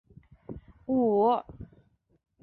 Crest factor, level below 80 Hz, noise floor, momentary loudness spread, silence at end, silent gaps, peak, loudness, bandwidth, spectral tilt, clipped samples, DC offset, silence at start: 16 dB; -58 dBFS; -64 dBFS; 23 LU; 0.8 s; none; -14 dBFS; -26 LUFS; 4.5 kHz; -11 dB/octave; under 0.1%; under 0.1%; 0.5 s